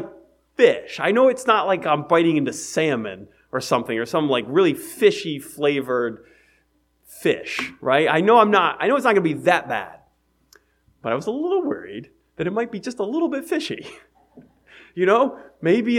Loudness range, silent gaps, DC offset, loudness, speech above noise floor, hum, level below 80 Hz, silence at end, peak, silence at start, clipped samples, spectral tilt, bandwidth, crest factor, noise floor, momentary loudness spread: 8 LU; none; under 0.1%; -20 LUFS; 44 dB; none; -64 dBFS; 0 s; 0 dBFS; 0 s; under 0.1%; -5 dB/octave; 16.5 kHz; 22 dB; -64 dBFS; 13 LU